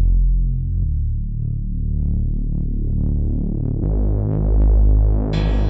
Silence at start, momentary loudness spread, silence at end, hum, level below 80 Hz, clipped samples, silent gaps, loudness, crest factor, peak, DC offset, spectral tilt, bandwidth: 0 s; 8 LU; 0 s; none; -18 dBFS; under 0.1%; none; -21 LUFS; 10 dB; -6 dBFS; under 0.1%; -10 dB/octave; 4.3 kHz